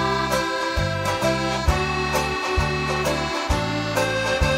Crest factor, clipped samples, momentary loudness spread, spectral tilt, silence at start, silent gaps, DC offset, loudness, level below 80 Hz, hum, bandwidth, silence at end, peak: 16 dB; under 0.1%; 2 LU; -4.5 dB/octave; 0 s; none; under 0.1%; -22 LUFS; -32 dBFS; none; 16 kHz; 0 s; -6 dBFS